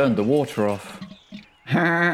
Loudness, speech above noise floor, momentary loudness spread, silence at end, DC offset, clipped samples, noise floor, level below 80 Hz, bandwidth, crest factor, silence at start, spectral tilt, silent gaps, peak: -22 LUFS; 23 dB; 22 LU; 0 s; under 0.1%; under 0.1%; -44 dBFS; -60 dBFS; 15.5 kHz; 14 dB; 0 s; -6.5 dB/octave; none; -8 dBFS